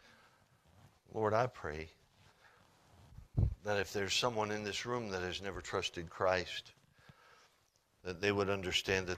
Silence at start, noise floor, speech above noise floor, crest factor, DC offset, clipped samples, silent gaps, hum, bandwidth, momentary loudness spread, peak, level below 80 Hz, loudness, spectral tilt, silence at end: 0.85 s; -74 dBFS; 37 dB; 22 dB; under 0.1%; under 0.1%; none; none; 15 kHz; 11 LU; -16 dBFS; -54 dBFS; -37 LUFS; -4 dB/octave; 0 s